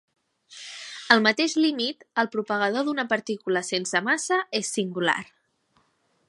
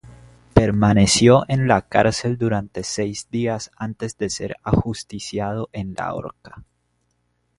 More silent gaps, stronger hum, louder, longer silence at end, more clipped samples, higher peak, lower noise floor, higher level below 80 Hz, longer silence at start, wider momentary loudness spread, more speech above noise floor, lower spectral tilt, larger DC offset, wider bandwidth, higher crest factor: neither; second, none vs 60 Hz at -45 dBFS; second, -24 LUFS vs -20 LUFS; about the same, 1.05 s vs 1 s; neither; about the same, 0 dBFS vs 0 dBFS; about the same, -68 dBFS vs -68 dBFS; second, -78 dBFS vs -40 dBFS; first, 0.5 s vs 0.05 s; second, 11 LU vs 14 LU; second, 43 dB vs 48 dB; second, -3 dB/octave vs -5 dB/octave; neither; about the same, 11.5 kHz vs 11.5 kHz; first, 26 dB vs 20 dB